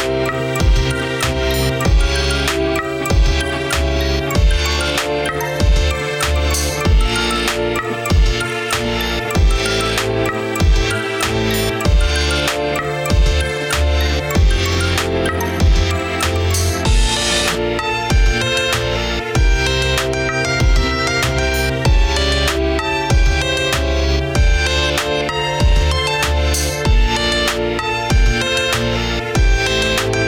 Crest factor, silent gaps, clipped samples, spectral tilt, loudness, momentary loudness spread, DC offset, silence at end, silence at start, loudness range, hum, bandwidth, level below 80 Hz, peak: 10 dB; none; under 0.1%; -4 dB/octave; -16 LUFS; 3 LU; 0.2%; 0 s; 0 s; 1 LU; none; 17 kHz; -18 dBFS; -4 dBFS